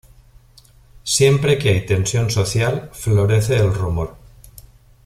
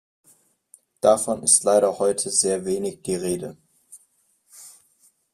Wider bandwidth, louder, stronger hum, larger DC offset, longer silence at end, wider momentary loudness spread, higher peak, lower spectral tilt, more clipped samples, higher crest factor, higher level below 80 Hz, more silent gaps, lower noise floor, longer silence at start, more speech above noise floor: about the same, 15 kHz vs 15 kHz; first, -18 LUFS vs -21 LUFS; neither; neither; second, 0.45 s vs 0.65 s; about the same, 10 LU vs 11 LU; about the same, -2 dBFS vs -2 dBFS; first, -5 dB/octave vs -3 dB/octave; neither; second, 16 dB vs 22 dB; first, -40 dBFS vs -62 dBFS; neither; second, -49 dBFS vs -64 dBFS; about the same, 0.95 s vs 1.05 s; second, 32 dB vs 43 dB